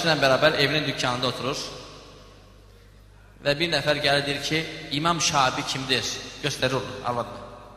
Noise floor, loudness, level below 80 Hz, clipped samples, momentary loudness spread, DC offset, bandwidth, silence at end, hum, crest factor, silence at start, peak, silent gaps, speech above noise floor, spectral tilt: -50 dBFS; -24 LUFS; -52 dBFS; under 0.1%; 11 LU; under 0.1%; 15 kHz; 0 s; none; 22 dB; 0 s; -4 dBFS; none; 26 dB; -3.5 dB/octave